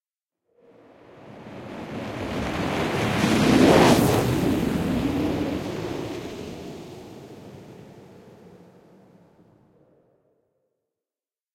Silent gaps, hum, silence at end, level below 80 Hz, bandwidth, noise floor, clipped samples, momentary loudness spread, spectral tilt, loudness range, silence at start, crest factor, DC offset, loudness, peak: none; none; 3.05 s; -46 dBFS; 16.5 kHz; under -90 dBFS; under 0.1%; 26 LU; -5.5 dB/octave; 18 LU; 1.15 s; 22 dB; under 0.1%; -22 LUFS; -4 dBFS